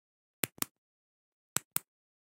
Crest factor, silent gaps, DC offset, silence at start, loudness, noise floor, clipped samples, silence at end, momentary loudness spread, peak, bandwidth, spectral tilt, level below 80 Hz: 36 dB; 0.71-1.56 s, 1.65-1.71 s; under 0.1%; 0.45 s; -37 LUFS; under -90 dBFS; under 0.1%; 0.5 s; 4 LU; -6 dBFS; 16.5 kHz; -1.5 dB/octave; -82 dBFS